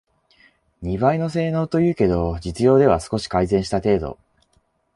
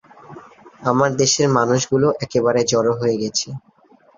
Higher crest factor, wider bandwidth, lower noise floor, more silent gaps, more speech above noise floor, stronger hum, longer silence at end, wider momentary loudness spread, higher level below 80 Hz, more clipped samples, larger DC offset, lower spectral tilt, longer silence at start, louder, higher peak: about the same, 18 dB vs 16 dB; first, 11.5 kHz vs 7.6 kHz; first, -65 dBFS vs -53 dBFS; neither; first, 46 dB vs 35 dB; neither; first, 0.85 s vs 0.6 s; about the same, 9 LU vs 8 LU; first, -38 dBFS vs -56 dBFS; neither; neither; first, -7 dB/octave vs -4.5 dB/octave; first, 0.8 s vs 0.3 s; about the same, -20 LUFS vs -18 LUFS; about the same, -2 dBFS vs -2 dBFS